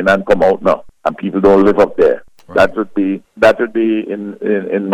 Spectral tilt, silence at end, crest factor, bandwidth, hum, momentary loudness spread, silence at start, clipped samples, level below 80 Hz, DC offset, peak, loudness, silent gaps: -7 dB/octave; 0 s; 12 dB; 12.5 kHz; none; 10 LU; 0 s; under 0.1%; -42 dBFS; under 0.1%; -2 dBFS; -14 LUFS; none